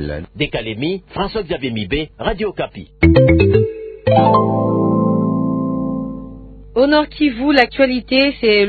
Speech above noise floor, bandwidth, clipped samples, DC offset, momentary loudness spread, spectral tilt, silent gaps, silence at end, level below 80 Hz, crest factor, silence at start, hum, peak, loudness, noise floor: 20 dB; 6.4 kHz; under 0.1%; under 0.1%; 11 LU; -9 dB/octave; none; 0 s; -30 dBFS; 16 dB; 0 s; none; 0 dBFS; -16 LUFS; -35 dBFS